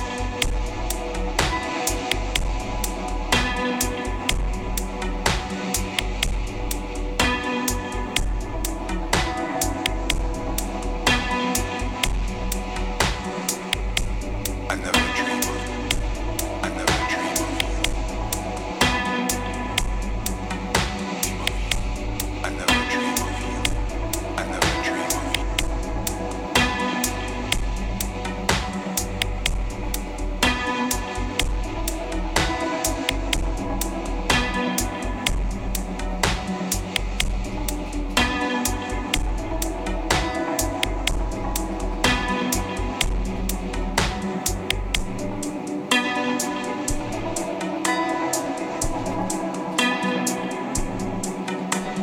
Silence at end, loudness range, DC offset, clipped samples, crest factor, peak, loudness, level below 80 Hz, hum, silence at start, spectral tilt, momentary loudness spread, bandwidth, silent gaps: 0 s; 2 LU; under 0.1%; under 0.1%; 16 dB; -8 dBFS; -25 LUFS; -30 dBFS; none; 0 s; -3.5 dB/octave; 7 LU; 17.5 kHz; none